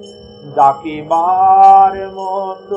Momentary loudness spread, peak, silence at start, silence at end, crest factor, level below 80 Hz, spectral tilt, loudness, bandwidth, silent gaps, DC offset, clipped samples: 16 LU; 0 dBFS; 0 s; 0 s; 12 dB; -52 dBFS; -6 dB/octave; -11 LUFS; 8 kHz; none; under 0.1%; 0.2%